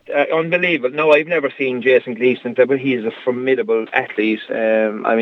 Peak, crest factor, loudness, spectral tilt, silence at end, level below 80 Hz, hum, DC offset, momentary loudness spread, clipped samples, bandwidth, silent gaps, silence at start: 0 dBFS; 16 dB; -17 LUFS; -7 dB/octave; 0 s; -76 dBFS; none; under 0.1%; 6 LU; under 0.1%; 6.2 kHz; none; 0.1 s